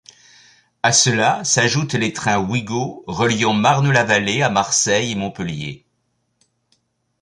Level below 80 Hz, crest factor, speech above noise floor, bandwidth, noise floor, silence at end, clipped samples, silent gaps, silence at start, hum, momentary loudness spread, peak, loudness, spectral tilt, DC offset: -52 dBFS; 20 dB; 51 dB; 11.5 kHz; -69 dBFS; 1.45 s; under 0.1%; none; 0.85 s; none; 11 LU; 0 dBFS; -17 LUFS; -3.5 dB/octave; under 0.1%